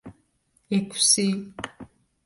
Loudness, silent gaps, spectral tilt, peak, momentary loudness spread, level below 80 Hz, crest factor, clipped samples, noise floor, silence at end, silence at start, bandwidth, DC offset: -22 LUFS; none; -2.5 dB/octave; -6 dBFS; 19 LU; -62 dBFS; 22 dB; under 0.1%; -68 dBFS; 0.4 s; 0.05 s; 11.5 kHz; under 0.1%